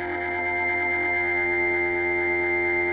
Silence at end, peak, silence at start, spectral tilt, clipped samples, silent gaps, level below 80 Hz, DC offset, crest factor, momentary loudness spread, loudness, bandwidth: 0 s; -14 dBFS; 0 s; -3.5 dB/octave; under 0.1%; none; -54 dBFS; under 0.1%; 10 dB; 3 LU; -23 LUFS; 4.8 kHz